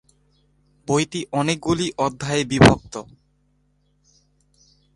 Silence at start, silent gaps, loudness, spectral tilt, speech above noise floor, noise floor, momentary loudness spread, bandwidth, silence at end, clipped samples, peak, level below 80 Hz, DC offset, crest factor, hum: 0.9 s; none; -20 LUFS; -5 dB/octave; 45 dB; -64 dBFS; 18 LU; 11.5 kHz; 1.95 s; under 0.1%; 0 dBFS; -44 dBFS; under 0.1%; 22 dB; 50 Hz at -45 dBFS